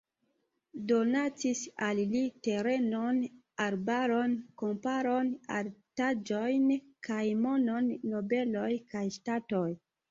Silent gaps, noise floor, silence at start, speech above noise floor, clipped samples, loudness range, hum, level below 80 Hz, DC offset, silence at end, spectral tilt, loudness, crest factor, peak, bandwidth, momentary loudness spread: none; -79 dBFS; 0.75 s; 47 dB; under 0.1%; 1 LU; none; -74 dBFS; under 0.1%; 0.35 s; -5.5 dB/octave; -32 LUFS; 16 dB; -16 dBFS; 7.8 kHz; 8 LU